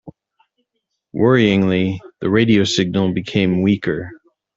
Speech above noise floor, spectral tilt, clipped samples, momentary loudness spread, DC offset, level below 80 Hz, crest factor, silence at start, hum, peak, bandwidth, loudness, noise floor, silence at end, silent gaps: 59 dB; -6 dB/octave; under 0.1%; 11 LU; under 0.1%; -52 dBFS; 16 dB; 0.05 s; none; -2 dBFS; 7.8 kHz; -17 LUFS; -75 dBFS; 0.4 s; none